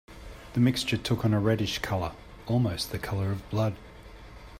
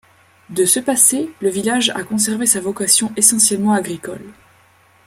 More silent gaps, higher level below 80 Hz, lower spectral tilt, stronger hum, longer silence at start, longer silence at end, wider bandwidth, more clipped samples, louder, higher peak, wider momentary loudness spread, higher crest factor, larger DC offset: neither; first, -48 dBFS vs -62 dBFS; first, -6 dB/octave vs -2 dB/octave; neither; second, 0.1 s vs 0.5 s; second, 0 s vs 0.75 s; about the same, 16 kHz vs 16.5 kHz; neither; second, -28 LUFS vs -14 LUFS; second, -12 dBFS vs 0 dBFS; first, 22 LU vs 15 LU; about the same, 18 dB vs 18 dB; neither